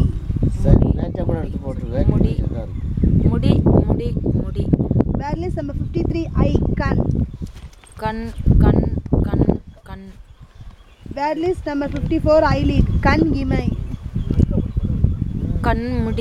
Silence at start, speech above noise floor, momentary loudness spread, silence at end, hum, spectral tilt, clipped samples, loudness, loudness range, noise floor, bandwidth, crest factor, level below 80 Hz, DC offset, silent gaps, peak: 0 s; 23 dB; 11 LU; 0 s; none; -9 dB/octave; under 0.1%; -19 LUFS; 3 LU; -41 dBFS; 9.2 kHz; 18 dB; -24 dBFS; under 0.1%; none; 0 dBFS